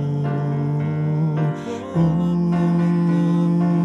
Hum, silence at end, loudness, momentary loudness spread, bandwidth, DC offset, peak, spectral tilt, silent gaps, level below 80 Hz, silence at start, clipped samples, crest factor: none; 0 s; -20 LUFS; 4 LU; 6.4 kHz; under 0.1%; -8 dBFS; -9.5 dB/octave; none; -50 dBFS; 0 s; under 0.1%; 10 dB